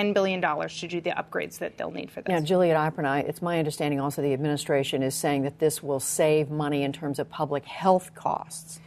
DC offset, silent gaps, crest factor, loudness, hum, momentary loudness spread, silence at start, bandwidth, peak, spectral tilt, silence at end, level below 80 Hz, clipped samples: under 0.1%; none; 18 dB; -27 LUFS; none; 9 LU; 0 s; 13.5 kHz; -8 dBFS; -5 dB/octave; 0 s; -64 dBFS; under 0.1%